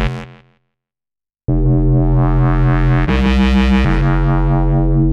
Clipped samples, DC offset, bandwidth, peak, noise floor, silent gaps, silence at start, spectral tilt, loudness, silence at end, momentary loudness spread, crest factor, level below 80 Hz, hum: under 0.1%; under 0.1%; 6.8 kHz; -4 dBFS; -89 dBFS; none; 0 s; -8.5 dB/octave; -14 LUFS; 0 s; 5 LU; 10 dB; -18 dBFS; none